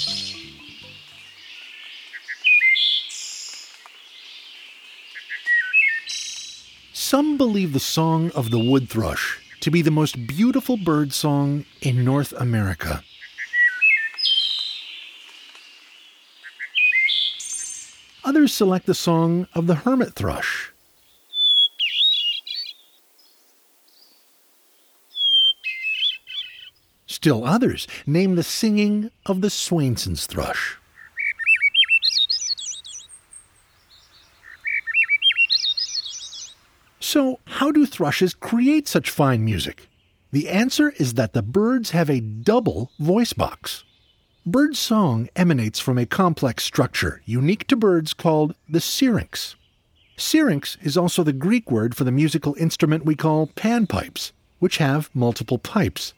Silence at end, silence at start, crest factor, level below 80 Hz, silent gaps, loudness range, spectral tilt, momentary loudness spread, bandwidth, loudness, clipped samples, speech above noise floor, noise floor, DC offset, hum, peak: 0.05 s; 0 s; 18 dB; -50 dBFS; none; 3 LU; -4.5 dB/octave; 19 LU; over 20 kHz; -20 LUFS; under 0.1%; 40 dB; -60 dBFS; under 0.1%; none; -4 dBFS